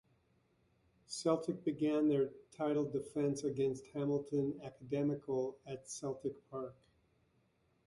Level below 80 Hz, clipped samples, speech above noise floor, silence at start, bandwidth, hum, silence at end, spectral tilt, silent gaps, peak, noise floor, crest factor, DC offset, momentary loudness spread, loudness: -76 dBFS; under 0.1%; 38 dB; 1.1 s; 11.5 kHz; none; 1.15 s; -6.5 dB/octave; none; -18 dBFS; -76 dBFS; 20 dB; under 0.1%; 12 LU; -38 LUFS